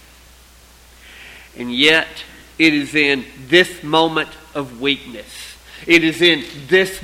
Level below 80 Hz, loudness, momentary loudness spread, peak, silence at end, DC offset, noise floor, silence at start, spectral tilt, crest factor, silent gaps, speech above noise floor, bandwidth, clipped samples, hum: -48 dBFS; -15 LUFS; 20 LU; 0 dBFS; 0 s; under 0.1%; -46 dBFS; 1.2 s; -3.5 dB/octave; 18 dB; none; 29 dB; 16 kHz; under 0.1%; none